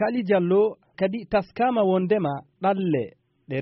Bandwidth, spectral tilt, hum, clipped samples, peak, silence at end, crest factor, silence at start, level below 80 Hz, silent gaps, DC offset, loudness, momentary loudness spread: 5.8 kHz; -6 dB/octave; none; under 0.1%; -8 dBFS; 0 s; 14 dB; 0 s; -58 dBFS; none; under 0.1%; -24 LUFS; 7 LU